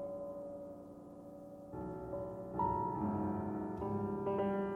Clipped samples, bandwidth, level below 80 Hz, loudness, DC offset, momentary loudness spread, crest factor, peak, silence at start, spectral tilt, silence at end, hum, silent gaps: under 0.1%; 4.1 kHz; -62 dBFS; -40 LUFS; under 0.1%; 16 LU; 16 dB; -24 dBFS; 0 s; -10 dB/octave; 0 s; none; none